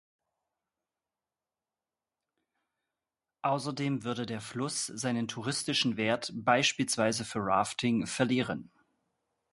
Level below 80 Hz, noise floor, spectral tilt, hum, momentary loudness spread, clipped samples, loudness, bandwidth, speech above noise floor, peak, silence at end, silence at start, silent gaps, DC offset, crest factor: -68 dBFS; under -90 dBFS; -4 dB/octave; none; 8 LU; under 0.1%; -31 LUFS; 11.5 kHz; over 59 dB; -10 dBFS; 0.9 s; 3.45 s; none; under 0.1%; 24 dB